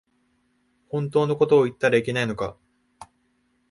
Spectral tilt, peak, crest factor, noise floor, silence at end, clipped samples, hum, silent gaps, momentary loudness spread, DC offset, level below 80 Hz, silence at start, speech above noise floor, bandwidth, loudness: -6.5 dB/octave; -6 dBFS; 18 dB; -68 dBFS; 0.65 s; under 0.1%; none; none; 12 LU; under 0.1%; -58 dBFS; 0.95 s; 46 dB; 11.5 kHz; -22 LUFS